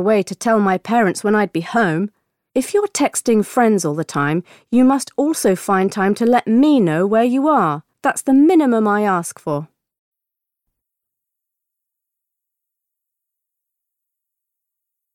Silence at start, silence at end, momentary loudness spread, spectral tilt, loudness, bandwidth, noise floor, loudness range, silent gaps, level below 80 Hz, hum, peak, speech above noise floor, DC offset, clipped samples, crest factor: 0 s; 5.5 s; 8 LU; -5.5 dB/octave; -17 LUFS; 16.5 kHz; -83 dBFS; 7 LU; none; -62 dBFS; none; -4 dBFS; 67 dB; under 0.1%; under 0.1%; 14 dB